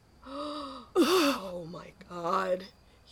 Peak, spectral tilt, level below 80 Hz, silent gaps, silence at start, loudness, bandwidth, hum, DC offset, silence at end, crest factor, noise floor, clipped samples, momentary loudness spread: -14 dBFS; -4 dB/octave; -62 dBFS; none; 0.25 s; -30 LUFS; 17.5 kHz; none; under 0.1%; 0.4 s; 18 dB; -52 dBFS; under 0.1%; 20 LU